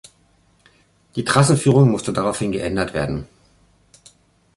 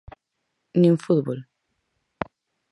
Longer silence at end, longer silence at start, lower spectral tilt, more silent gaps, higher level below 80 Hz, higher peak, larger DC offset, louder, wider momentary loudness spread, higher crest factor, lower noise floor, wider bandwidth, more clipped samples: about the same, 1.3 s vs 1.3 s; first, 1.15 s vs 0.75 s; second, -5.5 dB/octave vs -9 dB/octave; neither; first, -46 dBFS vs -60 dBFS; about the same, -2 dBFS vs -4 dBFS; neither; first, -19 LUFS vs -22 LUFS; second, 12 LU vs 16 LU; about the same, 20 dB vs 20 dB; second, -58 dBFS vs -78 dBFS; about the same, 11.5 kHz vs 11 kHz; neither